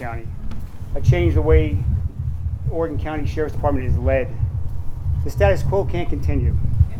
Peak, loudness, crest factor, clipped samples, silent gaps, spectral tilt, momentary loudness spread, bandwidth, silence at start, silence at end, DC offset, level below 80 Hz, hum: -2 dBFS; -21 LUFS; 16 dB; under 0.1%; none; -8.5 dB/octave; 13 LU; 8.2 kHz; 0 s; 0 s; under 0.1%; -24 dBFS; none